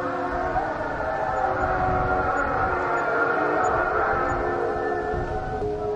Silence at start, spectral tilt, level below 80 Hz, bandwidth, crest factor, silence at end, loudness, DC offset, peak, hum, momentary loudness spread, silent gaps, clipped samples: 0 s; -7 dB/octave; -38 dBFS; 9 kHz; 14 dB; 0 s; -24 LUFS; under 0.1%; -10 dBFS; none; 5 LU; none; under 0.1%